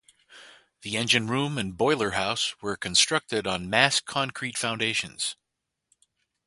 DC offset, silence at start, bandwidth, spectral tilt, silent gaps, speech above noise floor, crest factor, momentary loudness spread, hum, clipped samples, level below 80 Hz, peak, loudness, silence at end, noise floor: under 0.1%; 0.3 s; 11.5 kHz; -2.5 dB/octave; none; 57 dB; 26 dB; 10 LU; none; under 0.1%; -58 dBFS; -2 dBFS; -25 LUFS; 1.15 s; -83 dBFS